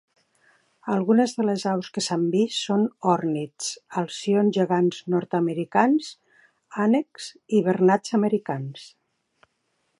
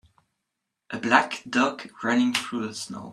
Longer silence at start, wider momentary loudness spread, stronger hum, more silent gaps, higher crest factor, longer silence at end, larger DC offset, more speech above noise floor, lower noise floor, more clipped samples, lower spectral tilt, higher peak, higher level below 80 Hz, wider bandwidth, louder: about the same, 0.85 s vs 0.9 s; about the same, 11 LU vs 11 LU; neither; neither; about the same, 20 dB vs 24 dB; first, 1.1 s vs 0 s; neither; second, 50 dB vs 57 dB; second, -73 dBFS vs -82 dBFS; neither; first, -5.5 dB/octave vs -3.5 dB/octave; about the same, -4 dBFS vs -2 dBFS; about the same, -74 dBFS vs -70 dBFS; second, 11.5 kHz vs 13 kHz; about the same, -23 LUFS vs -25 LUFS